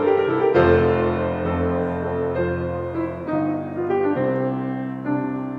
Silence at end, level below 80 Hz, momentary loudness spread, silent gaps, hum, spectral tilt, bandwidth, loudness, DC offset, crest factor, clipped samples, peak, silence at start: 0 s; -44 dBFS; 9 LU; none; none; -9.5 dB/octave; 5.4 kHz; -22 LUFS; under 0.1%; 16 dB; under 0.1%; -4 dBFS; 0 s